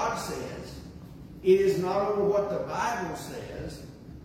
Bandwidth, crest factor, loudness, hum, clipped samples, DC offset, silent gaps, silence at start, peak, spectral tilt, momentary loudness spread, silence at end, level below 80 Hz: 15.5 kHz; 18 dB; -28 LUFS; none; under 0.1%; under 0.1%; none; 0 s; -10 dBFS; -5.5 dB/octave; 21 LU; 0 s; -52 dBFS